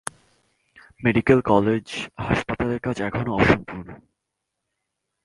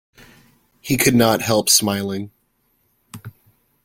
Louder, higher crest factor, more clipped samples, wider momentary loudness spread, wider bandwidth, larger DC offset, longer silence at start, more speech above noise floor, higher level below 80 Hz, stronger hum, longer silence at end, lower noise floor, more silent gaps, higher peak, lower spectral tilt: second, -22 LUFS vs -17 LUFS; about the same, 22 dB vs 20 dB; neither; second, 17 LU vs 25 LU; second, 11.5 kHz vs 16.5 kHz; neither; first, 1 s vs 0.85 s; first, 59 dB vs 48 dB; first, -44 dBFS vs -54 dBFS; neither; first, 1.3 s vs 0.55 s; first, -81 dBFS vs -65 dBFS; neither; about the same, -2 dBFS vs 0 dBFS; first, -6.5 dB/octave vs -3.5 dB/octave